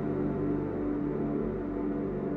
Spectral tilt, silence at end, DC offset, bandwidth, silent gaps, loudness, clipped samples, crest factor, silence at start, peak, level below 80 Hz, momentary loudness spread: -11 dB/octave; 0 s; under 0.1%; 4 kHz; none; -32 LUFS; under 0.1%; 10 dB; 0 s; -20 dBFS; -46 dBFS; 2 LU